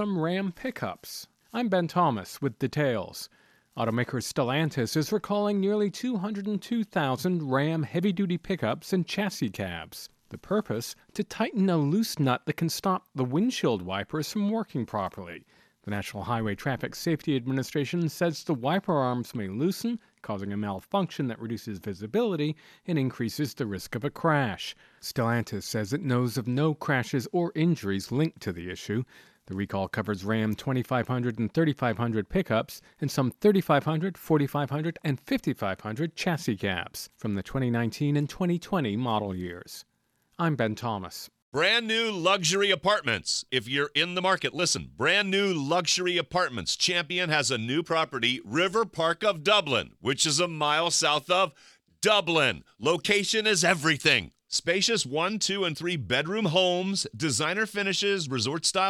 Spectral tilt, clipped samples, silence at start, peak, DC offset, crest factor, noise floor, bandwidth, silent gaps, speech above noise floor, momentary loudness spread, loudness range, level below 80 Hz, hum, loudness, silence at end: -4.5 dB/octave; under 0.1%; 0 s; -6 dBFS; under 0.1%; 20 dB; -71 dBFS; 15 kHz; 41.42-41.52 s; 44 dB; 11 LU; 6 LU; -60 dBFS; none; -27 LUFS; 0 s